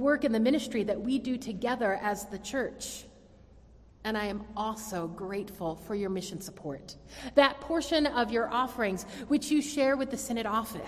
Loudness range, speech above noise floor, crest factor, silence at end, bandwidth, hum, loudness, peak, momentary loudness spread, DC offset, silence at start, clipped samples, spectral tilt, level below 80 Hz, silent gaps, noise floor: 8 LU; 25 dB; 22 dB; 0 s; 16 kHz; none; -31 LUFS; -8 dBFS; 13 LU; under 0.1%; 0 s; under 0.1%; -4 dB/octave; -56 dBFS; none; -55 dBFS